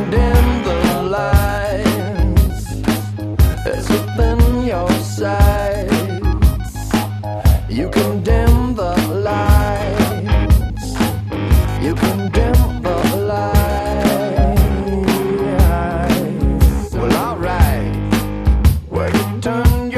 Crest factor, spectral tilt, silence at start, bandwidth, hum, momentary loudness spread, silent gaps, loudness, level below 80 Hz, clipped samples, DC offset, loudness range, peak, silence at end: 14 dB; -6.5 dB/octave; 0 s; 14 kHz; none; 5 LU; none; -16 LUFS; -18 dBFS; under 0.1%; under 0.1%; 1 LU; 0 dBFS; 0 s